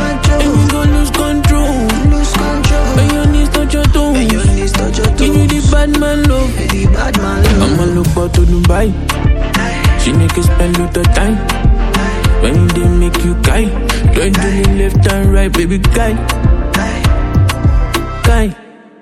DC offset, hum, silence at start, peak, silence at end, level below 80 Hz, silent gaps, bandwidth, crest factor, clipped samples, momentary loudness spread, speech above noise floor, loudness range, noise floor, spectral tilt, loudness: under 0.1%; none; 0 s; 0 dBFS; 0.4 s; -14 dBFS; none; 14 kHz; 10 dB; under 0.1%; 3 LU; 23 dB; 1 LU; -34 dBFS; -5.5 dB/octave; -12 LUFS